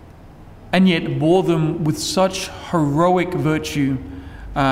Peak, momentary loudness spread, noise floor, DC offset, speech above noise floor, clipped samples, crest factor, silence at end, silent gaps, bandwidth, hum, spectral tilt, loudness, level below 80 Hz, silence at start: -4 dBFS; 11 LU; -41 dBFS; under 0.1%; 23 dB; under 0.1%; 14 dB; 0 s; none; 16 kHz; none; -6 dB/octave; -19 LUFS; -42 dBFS; 0 s